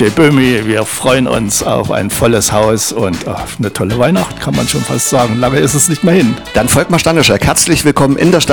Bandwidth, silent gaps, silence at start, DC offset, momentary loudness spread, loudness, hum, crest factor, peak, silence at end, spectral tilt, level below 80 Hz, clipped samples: over 20 kHz; none; 0 s; under 0.1%; 6 LU; -11 LUFS; none; 10 dB; 0 dBFS; 0 s; -4 dB/octave; -34 dBFS; under 0.1%